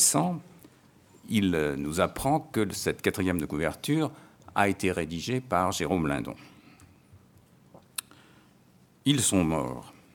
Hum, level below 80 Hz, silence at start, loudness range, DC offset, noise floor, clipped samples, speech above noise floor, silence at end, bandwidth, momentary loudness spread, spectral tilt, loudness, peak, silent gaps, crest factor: none; -54 dBFS; 0 s; 5 LU; under 0.1%; -60 dBFS; under 0.1%; 32 dB; 0.25 s; 19.5 kHz; 14 LU; -4 dB/octave; -28 LUFS; -6 dBFS; none; 24 dB